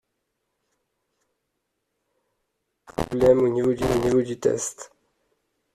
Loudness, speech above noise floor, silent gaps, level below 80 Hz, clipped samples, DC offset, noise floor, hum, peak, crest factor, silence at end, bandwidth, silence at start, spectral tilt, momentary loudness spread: -22 LUFS; 57 dB; none; -48 dBFS; under 0.1%; under 0.1%; -78 dBFS; none; -6 dBFS; 20 dB; 0.9 s; 14 kHz; 3 s; -6 dB/octave; 13 LU